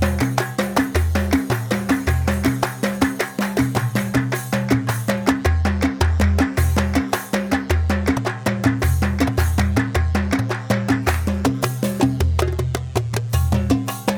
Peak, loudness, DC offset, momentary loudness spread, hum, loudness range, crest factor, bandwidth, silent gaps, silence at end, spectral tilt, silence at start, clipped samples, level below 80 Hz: -2 dBFS; -20 LUFS; under 0.1%; 3 LU; none; 1 LU; 16 dB; over 20 kHz; none; 0 s; -6 dB/octave; 0 s; under 0.1%; -28 dBFS